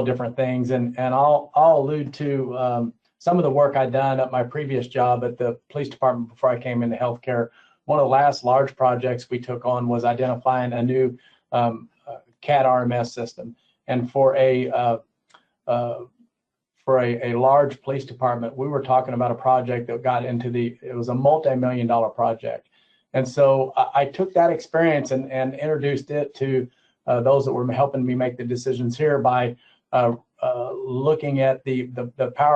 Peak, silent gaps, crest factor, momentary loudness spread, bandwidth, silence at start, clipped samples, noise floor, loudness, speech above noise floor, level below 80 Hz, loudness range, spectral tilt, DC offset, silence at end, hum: -6 dBFS; none; 16 dB; 10 LU; 8.2 kHz; 0 s; under 0.1%; -80 dBFS; -22 LUFS; 59 dB; -66 dBFS; 3 LU; -7.5 dB/octave; under 0.1%; 0 s; none